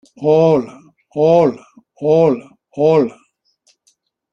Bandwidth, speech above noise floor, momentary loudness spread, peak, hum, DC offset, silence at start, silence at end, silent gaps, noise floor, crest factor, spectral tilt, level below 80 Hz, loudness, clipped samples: 7.2 kHz; 48 dB; 17 LU; -2 dBFS; none; under 0.1%; 0.2 s; 1.2 s; none; -62 dBFS; 14 dB; -8.5 dB/octave; -60 dBFS; -15 LUFS; under 0.1%